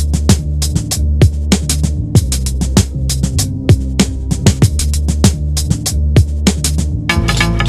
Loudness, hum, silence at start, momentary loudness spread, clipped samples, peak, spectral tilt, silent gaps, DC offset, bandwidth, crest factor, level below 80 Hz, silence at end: -14 LUFS; none; 0 s; 4 LU; 0.1%; 0 dBFS; -5 dB/octave; none; 0.8%; 13 kHz; 12 dB; -18 dBFS; 0 s